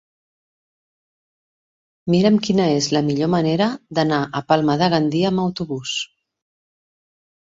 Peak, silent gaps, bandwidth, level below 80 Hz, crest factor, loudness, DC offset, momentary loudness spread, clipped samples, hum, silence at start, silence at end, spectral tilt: -4 dBFS; none; 7.8 kHz; -58 dBFS; 18 dB; -19 LUFS; under 0.1%; 9 LU; under 0.1%; none; 2.05 s; 1.5 s; -5.5 dB/octave